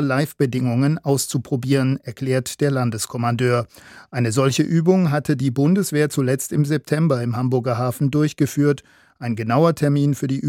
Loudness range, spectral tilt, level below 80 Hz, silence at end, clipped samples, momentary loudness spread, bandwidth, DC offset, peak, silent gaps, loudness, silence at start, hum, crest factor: 2 LU; -6.5 dB/octave; -60 dBFS; 0 s; under 0.1%; 6 LU; 16.5 kHz; under 0.1%; -4 dBFS; none; -20 LUFS; 0 s; none; 16 dB